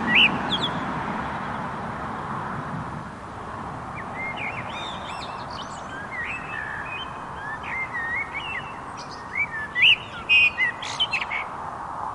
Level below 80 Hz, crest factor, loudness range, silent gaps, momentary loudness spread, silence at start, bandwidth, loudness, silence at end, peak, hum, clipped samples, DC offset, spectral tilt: -52 dBFS; 20 dB; 11 LU; none; 17 LU; 0 s; 11.5 kHz; -25 LUFS; 0 s; -6 dBFS; none; under 0.1%; under 0.1%; -3.5 dB/octave